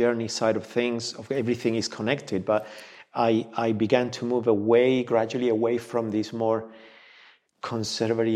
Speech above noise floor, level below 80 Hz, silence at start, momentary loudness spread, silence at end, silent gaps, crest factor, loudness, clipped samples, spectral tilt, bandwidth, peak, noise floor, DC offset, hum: 31 dB; -70 dBFS; 0 s; 9 LU; 0 s; none; 20 dB; -25 LUFS; under 0.1%; -5.5 dB/octave; 12.5 kHz; -6 dBFS; -56 dBFS; under 0.1%; none